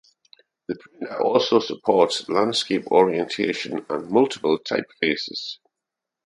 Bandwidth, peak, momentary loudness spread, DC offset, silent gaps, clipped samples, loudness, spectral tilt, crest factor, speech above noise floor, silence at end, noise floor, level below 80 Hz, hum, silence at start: 11.5 kHz; -2 dBFS; 15 LU; under 0.1%; none; under 0.1%; -22 LUFS; -4.5 dB/octave; 20 dB; 63 dB; 0.7 s; -85 dBFS; -68 dBFS; none; 0.7 s